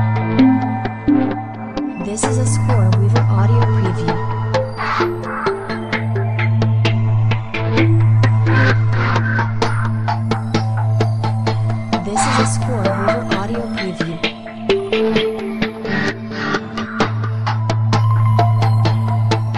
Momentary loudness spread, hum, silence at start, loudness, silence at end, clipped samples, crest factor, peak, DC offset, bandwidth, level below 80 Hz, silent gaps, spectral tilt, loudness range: 8 LU; none; 0 s; -17 LUFS; 0 s; under 0.1%; 14 dB; -2 dBFS; under 0.1%; 11 kHz; -40 dBFS; none; -6.5 dB/octave; 4 LU